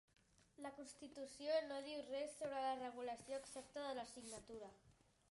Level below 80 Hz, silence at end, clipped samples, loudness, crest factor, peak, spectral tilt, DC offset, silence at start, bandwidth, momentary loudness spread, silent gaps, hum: -80 dBFS; 0.4 s; under 0.1%; -49 LUFS; 18 dB; -30 dBFS; -3 dB/octave; under 0.1%; 0.6 s; 11.5 kHz; 13 LU; none; none